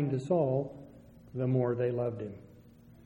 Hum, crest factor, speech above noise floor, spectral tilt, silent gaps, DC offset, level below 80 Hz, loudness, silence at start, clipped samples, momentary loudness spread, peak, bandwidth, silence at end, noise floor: none; 16 dB; 25 dB; -10 dB/octave; none; under 0.1%; -64 dBFS; -32 LUFS; 0 s; under 0.1%; 15 LU; -16 dBFS; 8.2 kHz; 0.1 s; -56 dBFS